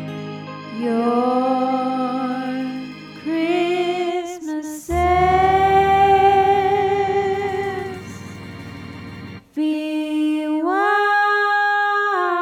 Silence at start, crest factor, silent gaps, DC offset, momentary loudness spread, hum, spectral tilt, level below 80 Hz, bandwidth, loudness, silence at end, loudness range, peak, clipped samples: 0 s; 14 dB; none; under 0.1%; 19 LU; none; -5.5 dB/octave; -42 dBFS; 15 kHz; -19 LUFS; 0 s; 8 LU; -4 dBFS; under 0.1%